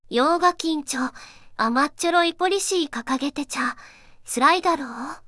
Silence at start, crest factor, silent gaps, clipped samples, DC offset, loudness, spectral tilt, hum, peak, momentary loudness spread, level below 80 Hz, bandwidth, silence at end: 0.1 s; 18 dB; none; under 0.1%; under 0.1%; -22 LUFS; -2 dB/octave; none; -4 dBFS; 10 LU; -58 dBFS; 12 kHz; 0.1 s